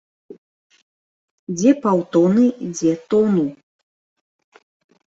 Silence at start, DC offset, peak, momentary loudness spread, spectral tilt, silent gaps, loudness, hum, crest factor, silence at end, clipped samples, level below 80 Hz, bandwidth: 0.3 s; under 0.1%; -4 dBFS; 10 LU; -7 dB/octave; 0.38-0.70 s, 0.82-1.47 s; -18 LUFS; none; 18 dB; 1.5 s; under 0.1%; -64 dBFS; 8 kHz